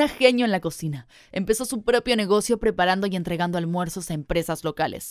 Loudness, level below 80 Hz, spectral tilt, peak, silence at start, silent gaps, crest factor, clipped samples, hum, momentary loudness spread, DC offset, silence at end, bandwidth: -24 LUFS; -46 dBFS; -4.5 dB/octave; -4 dBFS; 0 s; none; 20 dB; under 0.1%; none; 11 LU; under 0.1%; 0 s; 16 kHz